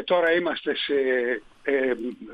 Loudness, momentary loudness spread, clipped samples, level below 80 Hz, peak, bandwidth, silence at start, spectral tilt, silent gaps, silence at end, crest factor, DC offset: -25 LUFS; 8 LU; under 0.1%; -64 dBFS; -10 dBFS; 5.2 kHz; 0 s; -6 dB/octave; none; 0 s; 16 dB; under 0.1%